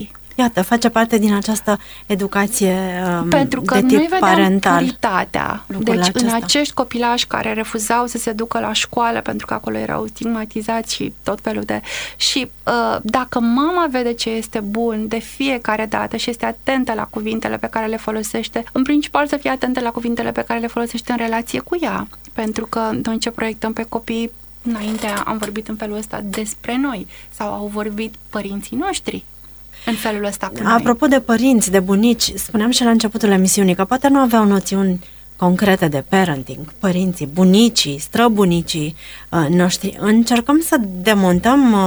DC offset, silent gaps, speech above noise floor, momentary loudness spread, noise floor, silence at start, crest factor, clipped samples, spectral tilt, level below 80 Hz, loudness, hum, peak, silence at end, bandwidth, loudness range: under 0.1%; none; 21 dB; 11 LU; -38 dBFS; 0 s; 16 dB; under 0.1%; -4.5 dB/octave; -44 dBFS; -17 LUFS; none; 0 dBFS; 0 s; over 20 kHz; 8 LU